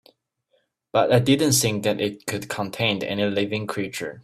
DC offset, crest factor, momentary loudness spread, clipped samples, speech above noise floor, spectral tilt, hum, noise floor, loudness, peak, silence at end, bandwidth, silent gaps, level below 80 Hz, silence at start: under 0.1%; 18 dB; 11 LU; under 0.1%; 47 dB; -4 dB/octave; none; -69 dBFS; -22 LUFS; -4 dBFS; 0.05 s; 16 kHz; none; -58 dBFS; 0.95 s